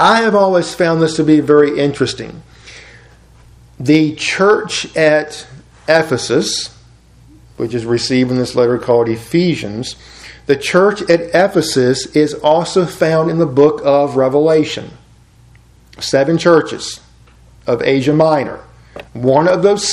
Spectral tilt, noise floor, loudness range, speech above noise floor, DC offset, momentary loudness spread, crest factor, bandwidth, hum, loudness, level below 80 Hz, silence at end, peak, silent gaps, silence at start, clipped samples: -5 dB/octave; -45 dBFS; 4 LU; 32 dB; under 0.1%; 14 LU; 14 dB; 13 kHz; none; -13 LUFS; -48 dBFS; 0 s; 0 dBFS; none; 0 s; under 0.1%